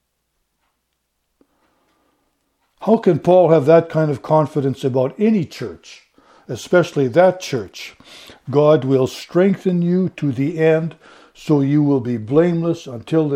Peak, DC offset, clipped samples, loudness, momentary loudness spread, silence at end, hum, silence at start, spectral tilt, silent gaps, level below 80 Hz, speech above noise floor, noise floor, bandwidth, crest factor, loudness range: 0 dBFS; under 0.1%; under 0.1%; -17 LUFS; 15 LU; 0 s; none; 2.8 s; -7.5 dB/octave; none; -60 dBFS; 55 dB; -72 dBFS; 15 kHz; 18 dB; 4 LU